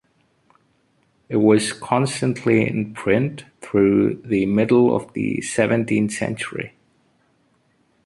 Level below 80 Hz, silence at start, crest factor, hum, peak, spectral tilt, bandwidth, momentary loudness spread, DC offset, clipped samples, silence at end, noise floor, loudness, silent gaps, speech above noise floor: -54 dBFS; 1.3 s; 18 dB; none; -2 dBFS; -6 dB/octave; 11.5 kHz; 10 LU; under 0.1%; under 0.1%; 1.35 s; -63 dBFS; -20 LUFS; none; 44 dB